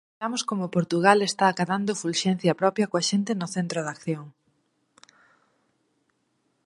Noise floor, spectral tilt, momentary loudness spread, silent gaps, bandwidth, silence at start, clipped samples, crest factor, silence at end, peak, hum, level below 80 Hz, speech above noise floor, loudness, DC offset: -72 dBFS; -4.5 dB/octave; 10 LU; none; 11.5 kHz; 0.2 s; under 0.1%; 24 dB; 2.35 s; -2 dBFS; none; -72 dBFS; 48 dB; -25 LUFS; under 0.1%